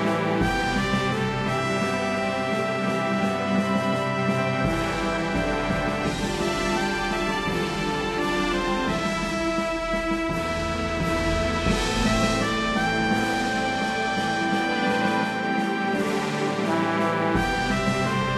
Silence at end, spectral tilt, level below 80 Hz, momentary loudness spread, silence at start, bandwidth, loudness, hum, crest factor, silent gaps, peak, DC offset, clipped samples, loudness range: 0 s; -5 dB/octave; -38 dBFS; 3 LU; 0 s; 13.5 kHz; -24 LUFS; none; 14 dB; none; -10 dBFS; under 0.1%; under 0.1%; 2 LU